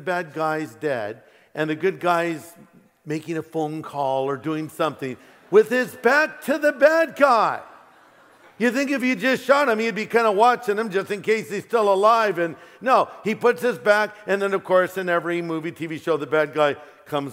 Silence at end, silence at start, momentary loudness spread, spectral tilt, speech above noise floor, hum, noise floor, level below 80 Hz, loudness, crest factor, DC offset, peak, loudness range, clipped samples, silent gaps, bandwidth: 0 s; 0 s; 11 LU; -5 dB/octave; 31 dB; none; -52 dBFS; -76 dBFS; -21 LUFS; 20 dB; under 0.1%; -2 dBFS; 6 LU; under 0.1%; none; 16 kHz